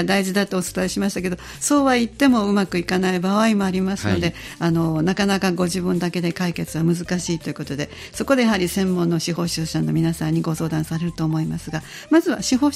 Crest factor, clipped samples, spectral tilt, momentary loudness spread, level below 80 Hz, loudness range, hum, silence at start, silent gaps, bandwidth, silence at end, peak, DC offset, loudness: 16 dB; under 0.1%; -5.5 dB/octave; 8 LU; -46 dBFS; 3 LU; none; 0 s; none; 16 kHz; 0 s; -4 dBFS; under 0.1%; -21 LUFS